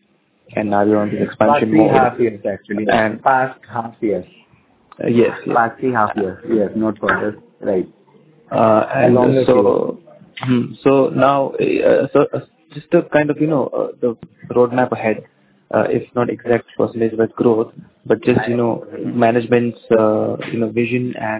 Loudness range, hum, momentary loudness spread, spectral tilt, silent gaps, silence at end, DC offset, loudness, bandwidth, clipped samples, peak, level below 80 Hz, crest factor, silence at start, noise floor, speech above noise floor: 4 LU; none; 11 LU; -11 dB/octave; none; 0 s; under 0.1%; -17 LUFS; 4 kHz; under 0.1%; 0 dBFS; -54 dBFS; 16 dB; 0.5 s; -55 dBFS; 39 dB